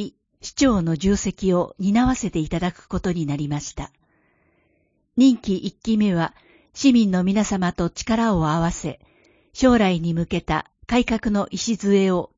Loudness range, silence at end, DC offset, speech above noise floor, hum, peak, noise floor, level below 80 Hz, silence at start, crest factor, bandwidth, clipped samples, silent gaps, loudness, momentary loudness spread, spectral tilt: 4 LU; 0.1 s; under 0.1%; 46 dB; none; -4 dBFS; -66 dBFS; -40 dBFS; 0 s; 18 dB; 7.8 kHz; under 0.1%; none; -21 LUFS; 11 LU; -5.5 dB/octave